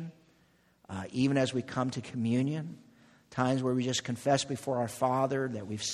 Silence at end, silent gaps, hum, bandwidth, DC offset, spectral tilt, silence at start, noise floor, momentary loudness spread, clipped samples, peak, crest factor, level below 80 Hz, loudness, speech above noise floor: 0 s; none; none; 13.5 kHz; under 0.1%; -5 dB/octave; 0 s; -67 dBFS; 11 LU; under 0.1%; -12 dBFS; 20 dB; -68 dBFS; -31 LUFS; 36 dB